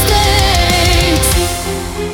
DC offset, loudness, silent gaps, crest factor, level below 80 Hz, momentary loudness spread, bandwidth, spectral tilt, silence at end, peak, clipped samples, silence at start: under 0.1%; -12 LUFS; none; 12 dB; -18 dBFS; 9 LU; 18.5 kHz; -3.5 dB/octave; 0 s; 0 dBFS; under 0.1%; 0 s